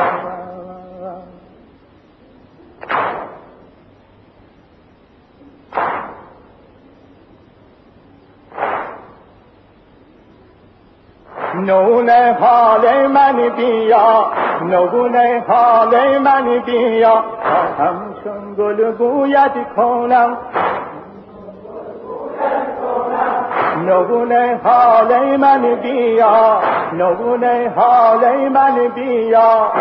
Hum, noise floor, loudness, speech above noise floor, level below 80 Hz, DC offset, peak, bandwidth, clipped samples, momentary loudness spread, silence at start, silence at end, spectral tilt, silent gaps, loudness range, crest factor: none; -48 dBFS; -13 LUFS; 36 dB; -56 dBFS; under 0.1%; -2 dBFS; 5.4 kHz; under 0.1%; 18 LU; 0 s; 0 s; -8.5 dB/octave; none; 16 LU; 14 dB